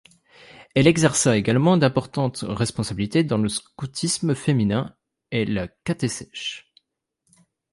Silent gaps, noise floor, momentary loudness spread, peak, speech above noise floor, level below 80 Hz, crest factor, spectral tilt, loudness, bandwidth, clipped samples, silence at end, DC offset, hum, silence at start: none; -74 dBFS; 12 LU; -2 dBFS; 53 dB; -50 dBFS; 20 dB; -5 dB/octave; -22 LUFS; 11.5 kHz; under 0.1%; 1.15 s; under 0.1%; none; 0.6 s